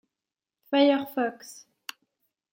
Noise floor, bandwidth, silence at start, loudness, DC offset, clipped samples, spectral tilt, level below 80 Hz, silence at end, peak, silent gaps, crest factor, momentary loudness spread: -90 dBFS; 16.5 kHz; 0.7 s; -25 LUFS; under 0.1%; under 0.1%; -3.5 dB/octave; -84 dBFS; 1 s; -10 dBFS; none; 20 dB; 22 LU